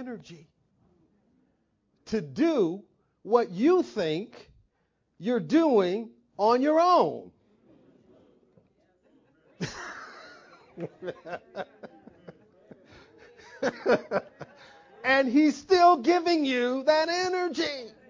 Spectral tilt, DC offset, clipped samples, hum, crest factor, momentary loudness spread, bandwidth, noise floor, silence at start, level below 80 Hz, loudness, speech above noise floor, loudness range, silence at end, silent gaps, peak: -5 dB/octave; under 0.1%; under 0.1%; none; 20 dB; 21 LU; 7.6 kHz; -74 dBFS; 0 s; -68 dBFS; -25 LUFS; 49 dB; 19 LU; 0.2 s; none; -8 dBFS